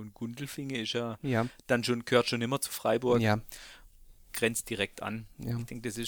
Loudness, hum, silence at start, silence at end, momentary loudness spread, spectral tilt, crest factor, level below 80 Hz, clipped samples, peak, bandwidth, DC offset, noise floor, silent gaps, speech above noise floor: -31 LUFS; none; 0 s; 0 s; 13 LU; -4.5 dB/octave; 22 dB; -58 dBFS; under 0.1%; -10 dBFS; over 20 kHz; under 0.1%; -55 dBFS; none; 23 dB